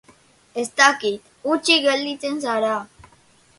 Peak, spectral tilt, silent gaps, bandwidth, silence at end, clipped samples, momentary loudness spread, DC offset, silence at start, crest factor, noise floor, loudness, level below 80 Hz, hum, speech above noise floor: 0 dBFS; -1.5 dB/octave; none; 11.5 kHz; 0.75 s; under 0.1%; 13 LU; under 0.1%; 0.55 s; 22 dB; -55 dBFS; -20 LUFS; -64 dBFS; none; 35 dB